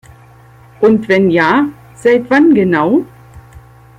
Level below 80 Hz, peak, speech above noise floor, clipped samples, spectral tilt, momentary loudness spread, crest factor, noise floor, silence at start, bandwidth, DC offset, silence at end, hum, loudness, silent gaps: -48 dBFS; -2 dBFS; 31 dB; under 0.1%; -7.5 dB/octave; 7 LU; 12 dB; -41 dBFS; 0.8 s; 11 kHz; under 0.1%; 0.4 s; none; -11 LUFS; none